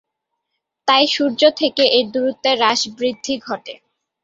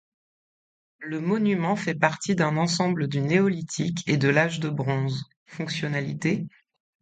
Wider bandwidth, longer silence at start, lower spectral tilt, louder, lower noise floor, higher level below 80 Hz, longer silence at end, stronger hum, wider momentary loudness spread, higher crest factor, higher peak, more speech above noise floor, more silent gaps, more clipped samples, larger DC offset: second, 7.8 kHz vs 9.4 kHz; second, 0.85 s vs 1 s; second, -2 dB/octave vs -5.5 dB/octave; first, -16 LUFS vs -25 LUFS; second, -77 dBFS vs under -90 dBFS; about the same, -64 dBFS vs -64 dBFS; about the same, 0.5 s vs 0.55 s; neither; about the same, 11 LU vs 10 LU; about the same, 18 dB vs 22 dB; first, 0 dBFS vs -4 dBFS; second, 60 dB vs over 65 dB; second, none vs 5.36-5.46 s; neither; neither